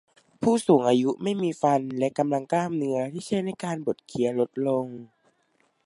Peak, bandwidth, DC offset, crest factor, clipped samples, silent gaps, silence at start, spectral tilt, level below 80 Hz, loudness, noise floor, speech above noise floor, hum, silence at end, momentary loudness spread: -8 dBFS; 11.5 kHz; under 0.1%; 18 dB; under 0.1%; none; 0.4 s; -6.5 dB/octave; -70 dBFS; -25 LUFS; -68 dBFS; 44 dB; none; 0.8 s; 10 LU